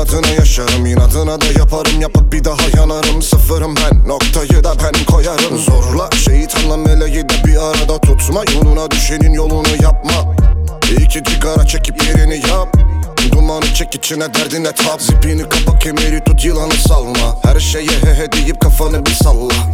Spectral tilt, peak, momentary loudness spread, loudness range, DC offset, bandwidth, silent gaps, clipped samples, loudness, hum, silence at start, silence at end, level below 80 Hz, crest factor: -4.5 dB/octave; 0 dBFS; 3 LU; 1 LU; under 0.1%; 16.5 kHz; none; 0.3%; -12 LUFS; none; 0 s; 0 s; -12 dBFS; 10 dB